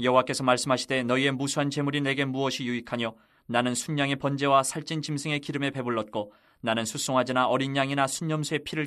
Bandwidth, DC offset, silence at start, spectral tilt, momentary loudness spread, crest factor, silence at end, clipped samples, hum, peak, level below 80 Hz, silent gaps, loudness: 13.5 kHz; under 0.1%; 0 s; -4.5 dB/octave; 8 LU; 20 dB; 0 s; under 0.1%; none; -6 dBFS; -66 dBFS; none; -27 LUFS